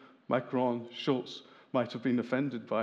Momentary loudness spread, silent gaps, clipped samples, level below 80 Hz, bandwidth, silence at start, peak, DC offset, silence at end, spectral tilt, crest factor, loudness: 4 LU; none; under 0.1%; -90 dBFS; 7.4 kHz; 0 s; -16 dBFS; under 0.1%; 0 s; -7 dB/octave; 18 dB; -33 LUFS